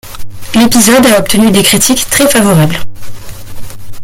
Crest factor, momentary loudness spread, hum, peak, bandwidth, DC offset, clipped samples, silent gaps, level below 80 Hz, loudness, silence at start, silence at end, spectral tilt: 8 dB; 11 LU; none; 0 dBFS; over 20 kHz; under 0.1%; 0.3%; none; -30 dBFS; -7 LUFS; 0.05 s; 0 s; -3.5 dB/octave